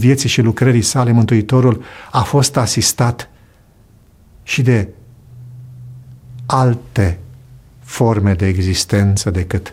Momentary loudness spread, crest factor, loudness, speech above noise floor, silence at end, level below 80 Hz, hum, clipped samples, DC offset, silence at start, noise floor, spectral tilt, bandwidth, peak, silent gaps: 20 LU; 14 dB; -15 LUFS; 34 dB; 0 s; -38 dBFS; none; under 0.1%; under 0.1%; 0 s; -47 dBFS; -5.5 dB/octave; 15.5 kHz; 0 dBFS; none